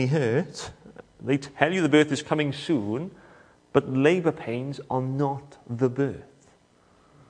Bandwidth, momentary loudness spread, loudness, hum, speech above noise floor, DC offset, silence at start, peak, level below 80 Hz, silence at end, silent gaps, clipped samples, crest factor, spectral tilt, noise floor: 10.5 kHz; 16 LU; -25 LUFS; none; 35 dB; under 0.1%; 0 s; -2 dBFS; -62 dBFS; 1.05 s; none; under 0.1%; 24 dB; -6.5 dB/octave; -60 dBFS